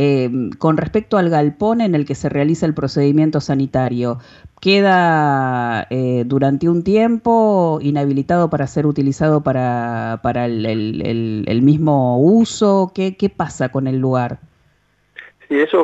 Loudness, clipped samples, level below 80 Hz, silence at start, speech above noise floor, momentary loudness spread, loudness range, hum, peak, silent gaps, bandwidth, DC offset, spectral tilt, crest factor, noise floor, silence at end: -16 LUFS; under 0.1%; -48 dBFS; 0 s; 43 dB; 7 LU; 2 LU; none; -2 dBFS; none; 8.2 kHz; under 0.1%; -7 dB/octave; 14 dB; -59 dBFS; 0 s